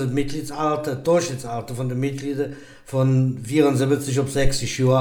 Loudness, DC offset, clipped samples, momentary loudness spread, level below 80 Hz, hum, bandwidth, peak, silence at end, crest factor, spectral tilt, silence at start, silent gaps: -22 LUFS; under 0.1%; under 0.1%; 9 LU; -36 dBFS; none; 17 kHz; -4 dBFS; 0 s; 16 dB; -6 dB/octave; 0 s; none